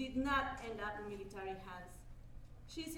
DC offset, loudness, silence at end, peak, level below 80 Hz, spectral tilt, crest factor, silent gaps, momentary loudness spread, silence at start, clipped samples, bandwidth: under 0.1%; -42 LUFS; 0 s; -22 dBFS; -56 dBFS; -4.5 dB/octave; 20 dB; none; 23 LU; 0 s; under 0.1%; 18 kHz